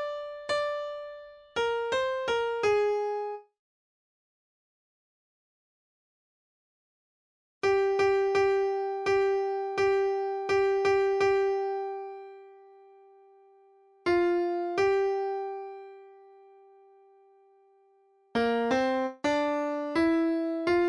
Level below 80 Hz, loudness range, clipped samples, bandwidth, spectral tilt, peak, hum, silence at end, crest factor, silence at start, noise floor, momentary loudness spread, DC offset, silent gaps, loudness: -64 dBFS; 8 LU; under 0.1%; 10.5 kHz; -4.5 dB/octave; -14 dBFS; none; 0 s; 16 dB; 0 s; -64 dBFS; 13 LU; under 0.1%; 3.59-7.61 s; -28 LUFS